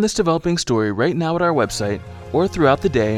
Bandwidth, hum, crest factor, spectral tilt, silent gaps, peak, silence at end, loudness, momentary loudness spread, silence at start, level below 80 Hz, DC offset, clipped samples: 14.5 kHz; none; 16 dB; -5.5 dB/octave; none; -2 dBFS; 0 s; -19 LUFS; 7 LU; 0 s; -42 dBFS; under 0.1%; under 0.1%